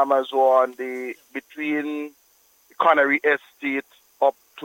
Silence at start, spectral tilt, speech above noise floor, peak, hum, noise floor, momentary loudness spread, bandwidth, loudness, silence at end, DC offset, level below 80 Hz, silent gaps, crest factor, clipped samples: 0 s; -4.5 dB/octave; 38 dB; -4 dBFS; none; -60 dBFS; 15 LU; 17 kHz; -22 LUFS; 0 s; under 0.1%; -80 dBFS; none; 18 dB; under 0.1%